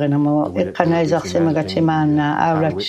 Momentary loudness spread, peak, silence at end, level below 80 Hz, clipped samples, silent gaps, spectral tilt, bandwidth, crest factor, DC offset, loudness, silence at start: 2 LU; 0 dBFS; 0 s; -54 dBFS; under 0.1%; none; -7 dB/octave; 9 kHz; 16 dB; under 0.1%; -17 LUFS; 0 s